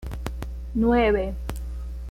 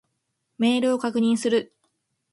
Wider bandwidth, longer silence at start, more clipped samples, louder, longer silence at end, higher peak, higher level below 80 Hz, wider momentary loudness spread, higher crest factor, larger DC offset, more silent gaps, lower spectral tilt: first, 16 kHz vs 11.5 kHz; second, 0 s vs 0.6 s; neither; about the same, -25 LUFS vs -23 LUFS; second, 0 s vs 0.7 s; about the same, -10 dBFS vs -10 dBFS; first, -32 dBFS vs -72 dBFS; first, 15 LU vs 4 LU; about the same, 16 dB vs 16 dB; neither; neither; first, -7 dB/octave vs -4.5 dB/octave